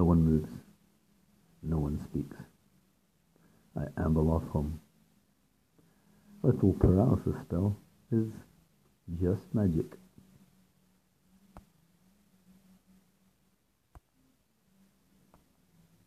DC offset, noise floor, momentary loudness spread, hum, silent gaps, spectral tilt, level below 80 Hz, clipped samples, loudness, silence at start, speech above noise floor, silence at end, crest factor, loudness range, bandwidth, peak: under 0.1%; -73 dBFS; 19 LU; none; none; -10 dB/octave; -48 dBFS; under 0.1%; -31 LUFS; 0 s; 44 dB; 2.1 s; 24 dB; 8 LU; 14.5 kHz; -8 dBFS